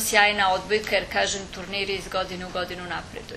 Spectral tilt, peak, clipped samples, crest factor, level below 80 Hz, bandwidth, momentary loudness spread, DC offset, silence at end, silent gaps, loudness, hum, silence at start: -2 dB/octave; -2 dBFS; under 0.1%; 24 dB; -48 dBFS; 13.5 kHz; 12 LU; under 0.1%; 0 s; none; -25 LUFS; none; 0 s